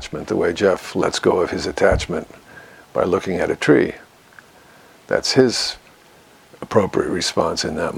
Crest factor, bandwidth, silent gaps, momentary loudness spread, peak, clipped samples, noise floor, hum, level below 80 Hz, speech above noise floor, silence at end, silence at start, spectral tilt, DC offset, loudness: 20 dB; 16 kHz; none; 11 LU; 0 dBFS; under 0.1%; -49 dBFS; none; -42 dBFS; 30 dB; 0 s; 0 s; -4.5 dB/octave; under 0.1%; -19 LUFS